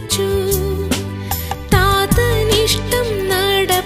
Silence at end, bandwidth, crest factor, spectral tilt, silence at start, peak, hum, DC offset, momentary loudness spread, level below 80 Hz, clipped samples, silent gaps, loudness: 0 s; 15.5 kHz; 16 dB; -4 dB/octave; 0 s; 0 dBFS; none; under 0.1%; 8 LU; -26 dBFS; under 0.1%; none; -16 LUFS